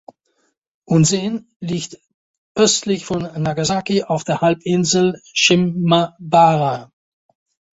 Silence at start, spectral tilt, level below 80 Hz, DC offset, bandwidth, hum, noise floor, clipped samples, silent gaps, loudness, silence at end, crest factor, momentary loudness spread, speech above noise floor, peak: 0.9 s; -4.5 dB/octave; -54 dBFS; under 0.1%; 8 kHz; none; -67 dBFS; under 0.1%; 1.56-1.60 s, 2.14-2.55 s; -17 LUFS; 0.9 s; 18 dB; 12 LU; 50 dB; 0 dBFS